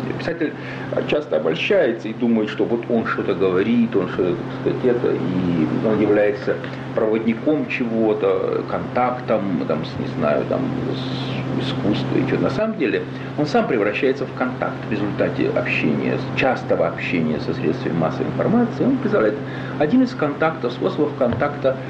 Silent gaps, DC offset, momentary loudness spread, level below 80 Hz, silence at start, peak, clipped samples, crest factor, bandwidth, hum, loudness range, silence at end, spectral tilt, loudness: none; under 0.1%; 6 LU; -52 dBFS; 0 s; -8 dBFS; under 0.1%; 12 dB; 8 kHz; none; 2 LU; 0 s; -8 dB/octave; -21 LUFS